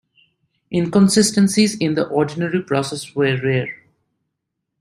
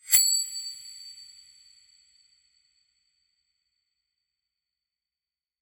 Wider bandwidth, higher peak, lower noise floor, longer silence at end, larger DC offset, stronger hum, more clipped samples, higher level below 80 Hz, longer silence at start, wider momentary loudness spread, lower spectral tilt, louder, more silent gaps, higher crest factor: second, 14.5 kHz vs over 20 kHz; about the same, -2 dBFS vs -4 dBFS; second, -78 dBFS vs under -90 dBFS; second, 1.05 s vs 4.35 s; neither; neither; neither; first, -58 dBFS vs -70 dBFS; first, 0.7 s vs 0.05 s; second, 10 LU vs 26 LU; first, -5 dB/octave vs 4.5 dB/octave; first, -18 LUFS vs -23 LUFS; neither; second, 16 dB vs 30 dB